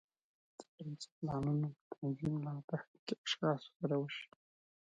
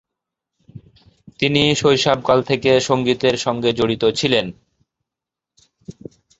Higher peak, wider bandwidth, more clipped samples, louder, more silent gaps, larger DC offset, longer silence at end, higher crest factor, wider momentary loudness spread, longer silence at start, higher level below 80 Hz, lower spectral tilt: second, -24 dBFS vs 0 dBFS; first, 9 kHz vs 8 kHz; neither; second, -40 LUFS vs -17 LUFS; first, 0.68-0.78 s, 1.12-1.22 s, 1.81-1.91 s, 2.64-2.68 s, 2.87-3.07 s, 3.18-3.24 s, 3.76-3.80 s vs none; neither; about the same, 0.6 s vs 0.5 s; about the same, 18 dB vs 20 dB; first, 13 LU vs 6 LU; second, 0.6 s vs 0.75 s; second, -72 dBFS vs -52 dBFS; first, -6.5 dB/octave vs -4.5 dB/octave